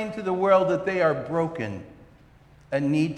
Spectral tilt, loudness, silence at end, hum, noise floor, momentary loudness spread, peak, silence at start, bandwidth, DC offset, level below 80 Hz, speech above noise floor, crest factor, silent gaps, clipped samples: -7.5 dB/octave; -24 LUFS; 0 s; none; -53 dBFS; 13 LU; -8 dBFS; 0 s; 10 kHz; under 0.1%; -58 dBFS; 29 dB; 18 dB; none; under 0.1%